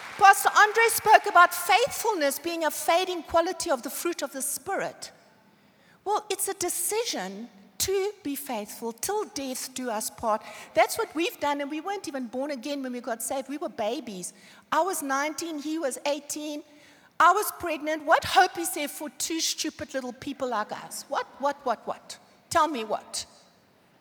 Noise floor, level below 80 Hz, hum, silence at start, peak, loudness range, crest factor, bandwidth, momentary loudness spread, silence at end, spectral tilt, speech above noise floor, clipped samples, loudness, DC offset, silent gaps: -61 dBFS; -64 dBFS; none; 0 s; -2 dBFS; 8 LU; 26 dB; over 20 kHz; 15 LU; 0.75 s; -1.5 dB/octave; 34 dB; under 0.1%; -26 LUFS; under 0.1%; none